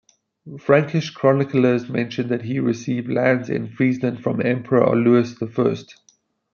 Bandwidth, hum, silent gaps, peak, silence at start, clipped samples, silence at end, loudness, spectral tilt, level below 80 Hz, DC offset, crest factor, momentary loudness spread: 7 kHz; none; none; -2 dBFS; 0.45 s; under 0.1%; 0.7 s; -20 LUFS; -7.5 dB/octave; -64 dBFS; under 0.1%; 18 dB; 8 LU